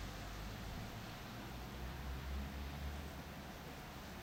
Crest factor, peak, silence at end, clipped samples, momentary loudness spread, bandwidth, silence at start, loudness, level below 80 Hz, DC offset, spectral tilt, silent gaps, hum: 12 dB; -36 dBFS; 0 s; under 0.1%; 4 LU; 16 kHz; 0 s; -49 LUFS; -50 dBFS; under 0.1%; -5 dB/octave; none; none